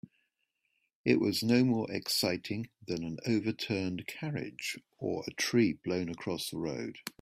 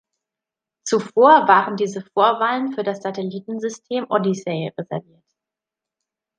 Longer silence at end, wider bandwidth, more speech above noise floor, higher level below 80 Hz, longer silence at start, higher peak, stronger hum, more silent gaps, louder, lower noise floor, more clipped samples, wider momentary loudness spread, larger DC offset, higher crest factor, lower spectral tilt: second, 0.1 s vs 1.4 s; first, 16 kHz vs 10 kHz; second, 48 dB vs 68 dB; about the same, -68 dBFS vs -72 dBFS; first, 1.05 s vs 0.85 s; second, -12 dBFS vs -2 dBFS; neither; neither; second, -33 LUFS vs -19 LUFS; second, -81 dBFS vs -87 dBFS; neither; second, 11 LU vs 15 LU; neither; about the same, 20 dB vs 20 dB; about the same, -5 dB/octave vs -5 dB/octave